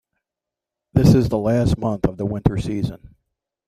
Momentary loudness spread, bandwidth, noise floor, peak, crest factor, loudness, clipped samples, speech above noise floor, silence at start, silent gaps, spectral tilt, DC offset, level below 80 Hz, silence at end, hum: 10 LU; 15 kHz; -87 dBFS; -2 dBFS; 18 dB; -20 LUFS; under 0.1%; 68 dB; 0.95 s; none; -8 dB/octave; under 0.1%; -36 dBFS; 0.7 s; none